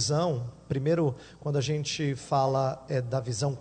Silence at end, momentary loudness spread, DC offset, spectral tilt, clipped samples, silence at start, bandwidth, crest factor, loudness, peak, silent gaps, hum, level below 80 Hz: 0 s; 6 LU; under 0.1%; -5.5 dB/octave; under 0.1%; 0 s; 9.4 kHz; 16 dB; -29 LUFS; -12 dBFS; none; none; -58 dBFS